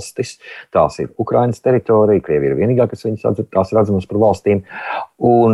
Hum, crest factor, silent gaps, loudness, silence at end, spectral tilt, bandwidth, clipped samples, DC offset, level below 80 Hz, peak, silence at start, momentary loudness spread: none; 14 dB; none; -16 LUFS; 0 s; -7.5 dB/octave; 12 kHz; under 0.1%; under 0.1%; -48 dBFS; -2 dBFS; 0 s; 11 LU